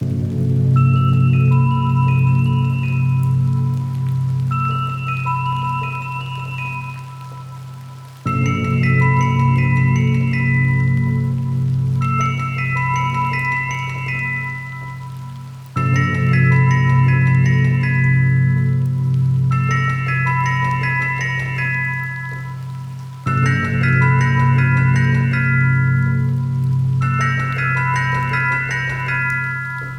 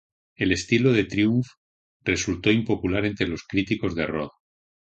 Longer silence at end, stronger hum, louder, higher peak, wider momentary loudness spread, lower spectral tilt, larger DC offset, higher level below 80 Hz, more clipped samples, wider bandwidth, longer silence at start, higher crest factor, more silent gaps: second, 0 s vs 0.65 s; neither; first, -17 LUFS vs -24 LUFS; about the same, -4 dBFS vs -6 dBFS; first, 12 LU vs 8 LU; first, -7.5 dB/octave vs -5.5 dB/octave; neither; about the same, -44 dBFS vs -46 dBFS; neither; second, 6.4 kHz vs 9 kHz; second, 0 s vs 0.4 s; second, 12 dB vs 18 dB; second, none vs 1.57-2.00 s